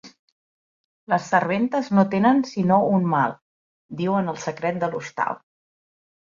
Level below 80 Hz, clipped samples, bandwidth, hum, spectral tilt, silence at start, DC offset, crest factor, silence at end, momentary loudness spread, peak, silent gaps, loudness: -66 dBFS; under 0.1%; 7.4 kHz; none; -7 dB/octave; 0.05 s; under 0.1%; 18 dB; 0.95 s; 9 LU; -4 dBFS; 0.19-1.07 s, 3.42-3.89 s; -22 LUFS